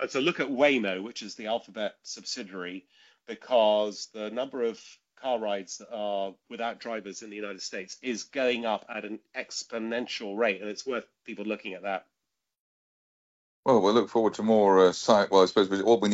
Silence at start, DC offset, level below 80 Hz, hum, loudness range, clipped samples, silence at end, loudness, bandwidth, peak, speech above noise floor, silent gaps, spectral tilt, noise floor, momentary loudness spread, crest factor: 0 s; under 0.1%; -72 dBFS; none; 10 LU; under 0.1%; 0 s; -28 LUFS; 8 kHz; -6 dBFS; 58 dB; 12.60-13.63 s; -4 dB/octave; -85 dBFS; 16 LU; 22 dB